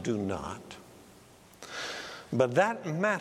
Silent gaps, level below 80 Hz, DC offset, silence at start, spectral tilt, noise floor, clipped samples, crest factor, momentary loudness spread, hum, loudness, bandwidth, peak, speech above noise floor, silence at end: none; -64 dBFS; under 0.1%; 0 s; -5.5 dB/octave; -56 dBFS; under 0.1%; 22 dB; 21 LU; none; -31 LUFS; 15.5 kHz; -10 dBFS; 26 dB; 0 s